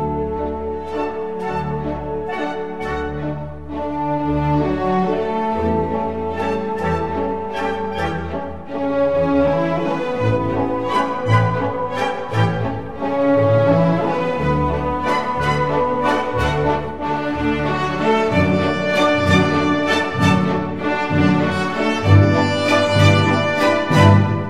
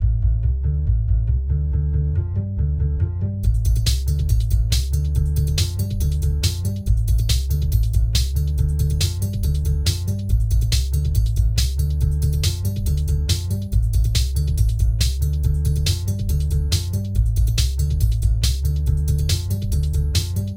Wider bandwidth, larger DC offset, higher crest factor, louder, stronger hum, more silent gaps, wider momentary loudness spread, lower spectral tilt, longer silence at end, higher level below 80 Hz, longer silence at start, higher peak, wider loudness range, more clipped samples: second, 12 kHz vs 16.5 kHz; first, 1% vs under 0.1%; about the same, 18 dB vs 14 dB; first, -18 LUFS vs -21 LUFS; neither; neither; first, 10 LU vs 3 LU; first, -7 dB/octave vs -5 dB/octave; about the same, 0 s vs 0 s; second, -38 dBFS vs -20 dBFS; about the same, 0 s vs 0 s; first, 0 dBFS vs -4 dBFS; first, 6 LU vs 1 LU; neither